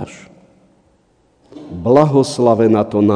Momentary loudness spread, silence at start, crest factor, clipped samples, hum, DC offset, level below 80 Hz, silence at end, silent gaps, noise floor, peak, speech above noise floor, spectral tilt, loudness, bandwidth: 17 LU; 0 s; 16 dB; 0.1%; none; under 0.1%; -52 dBFS; 0 s; none; -56 dBFS; 0 dBFS; 44 dB; -7.5 dB/octave; -13 LUFS; 10 kHz